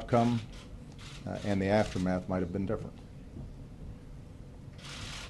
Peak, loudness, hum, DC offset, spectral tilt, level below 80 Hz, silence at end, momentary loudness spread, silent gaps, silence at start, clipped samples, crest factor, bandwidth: -14 dBFS; -32 LUFS; none; under 0.1%; -6.5 dB/octave; -50 dBFS; 0 s; 21 LU; none; 0 s; under 0.1%; 20 dB; 12 kHz